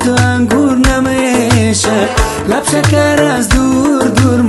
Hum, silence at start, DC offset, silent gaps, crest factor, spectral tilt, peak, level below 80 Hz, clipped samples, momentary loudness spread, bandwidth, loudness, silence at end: none; 0 s; under 0.1%; none; 10 dB; -5 dB/octave; 0 dBFS; -22 dBFS; under 0.1%; 3 LU; 12.5 kHz; -11 LUFS; 0 s